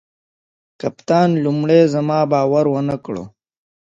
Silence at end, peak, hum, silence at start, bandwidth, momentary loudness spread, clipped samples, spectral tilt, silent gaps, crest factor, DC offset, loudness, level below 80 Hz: 0.6 s; -2 dBFS; none; 0.85 s; 7.8 kHz; 14 LU; under 0.1%; -8 dB/octave; none; 16 dB; under 0.1%; -17 LUFS; -58 dBFS